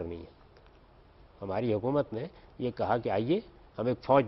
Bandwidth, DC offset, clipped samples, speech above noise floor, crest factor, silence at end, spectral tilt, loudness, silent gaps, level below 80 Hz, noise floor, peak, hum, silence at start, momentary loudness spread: 5.8 kHz; under 0.1%; under 0.1%; 28 dB; 20 dB; 0 s; -10 dB/octave; -32 LUFS; none; -58 dBFS; -58 dBFS; -10 dBFS; none; 0 s; 15 LU